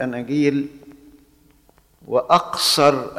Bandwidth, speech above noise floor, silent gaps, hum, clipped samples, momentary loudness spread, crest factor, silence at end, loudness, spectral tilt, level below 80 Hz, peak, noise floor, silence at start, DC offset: 15.5 kHz; 37 dB; none; none; under 0.1%; 10 LU; 20 dB; 0 s; -18 LUFS; -4 dB/octave; -58 dBFS; -2 dBFS; -56 dBFS; 0 s; under 0.1%